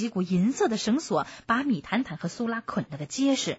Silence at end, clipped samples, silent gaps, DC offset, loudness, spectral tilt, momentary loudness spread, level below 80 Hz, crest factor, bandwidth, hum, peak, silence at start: 0 s; under 0.1%; none; under 0.1%; -27 LUFS; -5 dB/octave; 8 LU; -62 dBFS; 14 dB; 8 kHz; none; -12 dBFS; 0 s